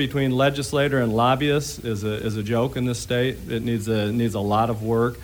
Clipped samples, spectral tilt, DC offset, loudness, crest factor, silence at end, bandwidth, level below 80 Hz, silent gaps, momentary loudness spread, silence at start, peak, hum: under 0.1%; -6 dB/octave; under 0.1%; -23 LUFS; 16 dB; 0 s; over 20 kHz; -46 dBFS; none; 6 LU; 0 s; -6 dBFS; none